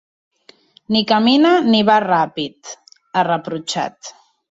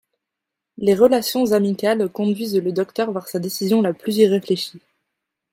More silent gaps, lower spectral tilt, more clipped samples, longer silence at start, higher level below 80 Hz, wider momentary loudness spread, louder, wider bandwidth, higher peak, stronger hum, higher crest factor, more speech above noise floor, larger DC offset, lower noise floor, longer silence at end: neither; about the same, -4.5 dB/octave vs -5.5 dB/octave; neither; about the same, 0.9 s vs 0.8 s; about the same, -62 dBFS vs -64 dBFS; first, 23 LU vs 8 LU; first, -16 LUFS vs -19 LUFS; second, 8 kHz vs 16.5 kHz; about the same, -2 dBFS vs -2 dBFS; neither; about the same, 16 dB vs 18 dB; second, 34 dB vs 64 dB; neither; second, -50 dBFS vs -83 dBFS; second, 0.4 s vs 0.75 s